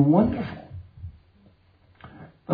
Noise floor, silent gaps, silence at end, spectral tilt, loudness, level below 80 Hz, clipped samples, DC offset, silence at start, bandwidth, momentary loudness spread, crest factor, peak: -59 dBFS; none; 0 s; -12 dB/octave; -24 LUFS; -50 dBFS; under 0.1%; under 0.1%; 0 s; 5 kHz; 26 LU; 18 dB; -8 dBFS